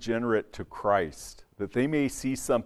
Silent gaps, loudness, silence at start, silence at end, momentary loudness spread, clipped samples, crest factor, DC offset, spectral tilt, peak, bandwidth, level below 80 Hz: none; -29 LUFS; 0 s; 0 s; 14 LU; under 0.1%; 18 dB; under 0.1%; -5.5 dB/octave; -10 dBFS; 14.5 kHz; -52 dBFS